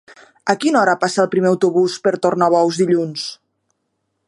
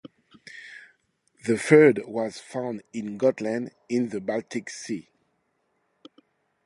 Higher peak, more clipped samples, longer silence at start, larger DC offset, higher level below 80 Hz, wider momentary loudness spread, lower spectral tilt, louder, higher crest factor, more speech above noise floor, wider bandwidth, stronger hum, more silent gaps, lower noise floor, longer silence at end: first, 0 dBFS vs -4 dBFS; neither; first, 0.45 s vs 0.05 s; neither; about the same, -68 dBFS vs -72 dBFS; second, 9 LU vs 23 LU; about the same, -5 dB/octave vs -6 dB/octave; first, -17 LUFS vs -25 LUFS; second, 18 dB vs 24 dB; first, 56 dB vs 49 dB; about the same, 11.5 kHz vs 11.5 kHz; neither; neither; about the same, -72 dBFS vs -73 dBFS; second, 0.95 s vs 1.65 s